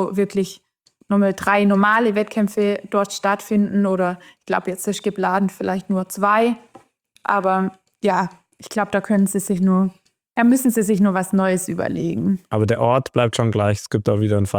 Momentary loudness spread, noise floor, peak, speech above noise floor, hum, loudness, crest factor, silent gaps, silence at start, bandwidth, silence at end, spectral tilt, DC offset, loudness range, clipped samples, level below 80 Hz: 8 LU; -50 dBFS; -2 dBFS; 31 dB; none; -19 LUFS; 18 dB; none; 0 s; 19.5 kHz; 0 s; -6 dB/octave; under 0.1%; 3 LU; under 0.1%; -58 dBFS